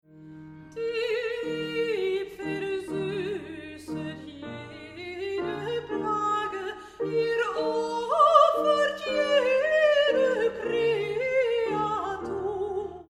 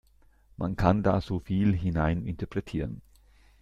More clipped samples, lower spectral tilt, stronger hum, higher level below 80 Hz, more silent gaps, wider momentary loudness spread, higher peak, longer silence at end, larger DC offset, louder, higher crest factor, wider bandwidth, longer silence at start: neither; second, -5 dB/octave vs -9 dB/octave; neither; second, -62 dBFS vs -44 dBFS; neither; first, 17 LU vs 10 LU; about the same, -6 dBFS vs -8 dBFS; second, 0.05 s vs 0.6 s; neither; about the same, -26 LUFS vs -28 LUFS; about the same, 22 dB vs 22 dB; first, 13.5 kHz vs 7.6 kHz; second, 0.15 s vs 0.6 s